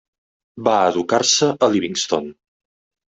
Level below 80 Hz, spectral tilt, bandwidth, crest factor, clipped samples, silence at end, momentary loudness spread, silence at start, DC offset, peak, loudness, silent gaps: -64 dBFS; -3 dB/octave; 8.4 kHz; 18 dB; under 0.1%; 0.75 s; 8 LU; 0.55 s; under 0.1%; -2 dBFS; -18 LUFS; none